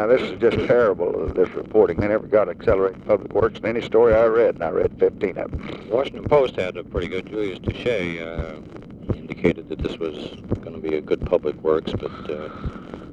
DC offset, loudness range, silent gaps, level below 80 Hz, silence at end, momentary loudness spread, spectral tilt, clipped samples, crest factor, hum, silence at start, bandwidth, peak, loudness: under 0.1%; 7 LU; none; -40 dBFS; 0 s; 13 LU; -7.5 dB/octave; under 0.1%; 18 dB; none; 0 s; 7.6 kHz; -2 dBFS; -22 LUFS